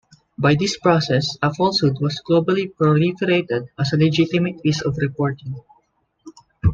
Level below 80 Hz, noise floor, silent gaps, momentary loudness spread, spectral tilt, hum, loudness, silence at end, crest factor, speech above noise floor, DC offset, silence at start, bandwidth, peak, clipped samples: -44 dBFS; -63 dBFS; none; 7 LU; -6 dB/octave; none; -19 LUFS; 0 s; 16 dB; 45 dB; under 0.1%; 0.4 s; 7.8 kHz; -4 dBFS; under 0.1%